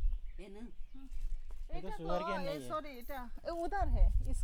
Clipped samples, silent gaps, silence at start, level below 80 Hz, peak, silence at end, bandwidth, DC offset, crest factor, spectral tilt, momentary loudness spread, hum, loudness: under 0.1%; none; 0 s; -36 dBFS; -18 dBFS; 0 s; 14 kHz; under 0.1%; 16 dB; -6.5 dB/octave; 17 LU; none; -40 LUFS